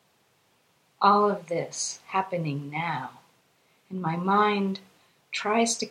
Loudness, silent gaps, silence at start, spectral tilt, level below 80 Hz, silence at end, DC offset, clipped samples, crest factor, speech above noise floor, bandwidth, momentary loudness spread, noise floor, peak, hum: -26 LUFS; none; 1 s; -4 dB/octave; -76 dBFS; 0 s; under 0.1%; under 0.1%; 22 dB; 40 dB; 13 kHz; 13 LU; -66 dBFS; -6 dBFS; none